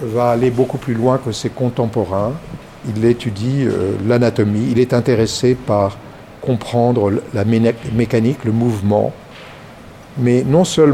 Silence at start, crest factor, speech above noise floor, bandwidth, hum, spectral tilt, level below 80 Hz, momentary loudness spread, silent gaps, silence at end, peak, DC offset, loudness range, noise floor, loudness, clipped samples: 0 s; 16 dB; 22 dB; 14 kHz; none; -7 dB/octave; -44 dBFS; 14 LU; none; 0 s; 0 dBFS; under 0.1%; 2 LU; -37 dBFS; -16 LUFS; under 0.1%